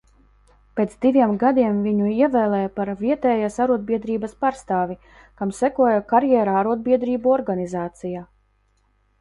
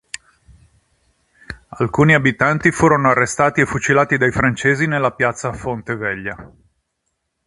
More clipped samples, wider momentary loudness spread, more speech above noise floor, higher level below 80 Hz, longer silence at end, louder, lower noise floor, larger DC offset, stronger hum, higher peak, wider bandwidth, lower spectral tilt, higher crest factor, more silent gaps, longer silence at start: neither; second, 11 LU vs 19 LU; second, 43 dB vs 56 dB; second, -54 dBFS vs -44 dBFS; about the same, 0.95 s vs 1 s; second, -21 LUFS vs -16 LUFS; second, -63 dBFS vs -73 dBFS; neither; neither; second, -6 dBFS vs 0 dBFS; about the same, 11.5 kHz vs 11.5 kHz; first, -7.5 dB/octave vs -5.5 dB/octave; about the same, 16 dB vs 18 dB; neither; second, 0.75 s vs 1.5 s